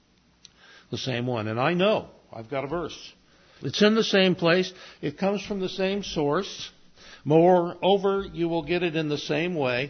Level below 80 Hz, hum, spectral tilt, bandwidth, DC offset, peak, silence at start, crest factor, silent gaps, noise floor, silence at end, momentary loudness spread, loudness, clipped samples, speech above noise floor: -56 dBFS; none; -5.5 dB/octave; 6.6 kHz; under 0.1%; -6 dBFS; 0.9 s; 20 dB; none; -57 dBFS; 0 s; 16 LU; -25 LUFS; under 0.1%; 32 dB